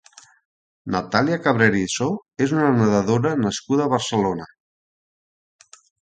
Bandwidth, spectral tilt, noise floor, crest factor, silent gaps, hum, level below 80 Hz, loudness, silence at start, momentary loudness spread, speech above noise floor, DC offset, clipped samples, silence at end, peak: 9.4 kHz; -5.5 dB/octave; under -90 dBFS; 22 dB; none; none; -54 dBFS; -20 LUFS; 0.85 s; 8 LU; over 70 dB; under 0.1%; under 0.1%; 1.65 s; 0 dBFS